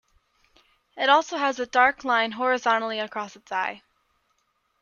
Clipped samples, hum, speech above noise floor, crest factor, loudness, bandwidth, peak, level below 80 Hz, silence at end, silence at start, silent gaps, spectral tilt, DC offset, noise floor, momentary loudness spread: under 0.1%; none; 48 dB; 20 dB; -24 LUFS; 7.2 kHz; -6 dBFS; -68 dBFS; 1.05 s; 0.95 s; none; -2 dB/octave; under 0.1%; -72 dBFS; 11 LU